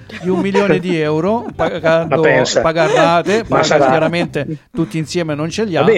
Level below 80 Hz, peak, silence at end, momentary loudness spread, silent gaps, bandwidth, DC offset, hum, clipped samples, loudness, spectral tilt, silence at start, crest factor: -44 dBFS; 0 dBFS; 0 s; 8 LU; none; 12 kHz; under 0.1%; none; under 0.1%; -15 LUFS; -5.5 dB/octave; 0 s; 14 dB